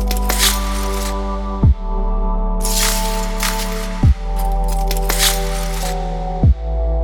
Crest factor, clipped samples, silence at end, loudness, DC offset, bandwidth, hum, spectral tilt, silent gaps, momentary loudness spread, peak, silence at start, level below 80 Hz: 16 dB; under 0.1%; 0 s; -18 LUFS; under 0.1%; over 20 kHz; none; -4 dB/octave; none; 8 LU; 0 dBFS; 0 s; -18 dBFS